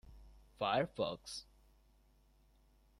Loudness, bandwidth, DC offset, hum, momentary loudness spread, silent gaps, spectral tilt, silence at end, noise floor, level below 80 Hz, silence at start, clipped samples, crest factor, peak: -39 LUFS; 15 kHz; under 0.1%; none; 13 LU; none; -4.5 dB/octave; 1.6 s; -69 dBFS; -64 dBFS; 0.05 s; under 0.1%; 22 dB; -22 dBFS